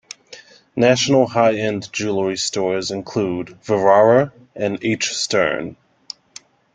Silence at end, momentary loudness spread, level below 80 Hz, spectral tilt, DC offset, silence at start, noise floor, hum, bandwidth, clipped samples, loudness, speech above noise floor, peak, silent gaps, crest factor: 1 s; 20 LU; -58 dBFS; -4 dB/octave; under 0.1%; 0.3 s; -45 dBFS; none; 9.6 kHz; under 0.1%; -18 LUFS; 27 dB; -2 dBFS; none; 18 dB